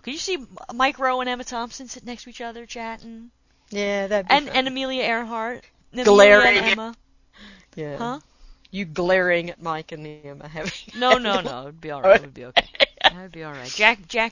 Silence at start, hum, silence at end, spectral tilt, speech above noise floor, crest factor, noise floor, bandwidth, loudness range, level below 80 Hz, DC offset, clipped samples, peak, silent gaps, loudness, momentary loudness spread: 0.05 s; none; 0 s; -3.5 dB/octave; 27 dB; 22 dB; -48 dBFS; 8 kHz; 9 LU; -52 dBFS; under 0.1%; under 0.1%; 0 dBFS; none; -20 LUFS; 20 LU